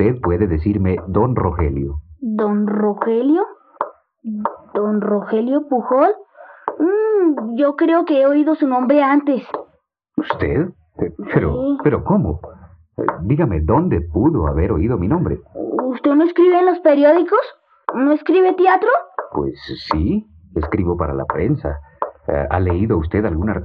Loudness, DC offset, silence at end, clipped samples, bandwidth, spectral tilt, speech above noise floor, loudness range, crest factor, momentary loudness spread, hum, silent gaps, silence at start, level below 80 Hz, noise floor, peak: -17 LUFS; under 0.1%; 0 s; under 0.1%; 5.2 kHz; -11 dB/octave; 45 dB; 5 LU; 16 dB; 13 LU; none; none; 0 s; -36 dBFS; -61 dBFS; -2 dBFS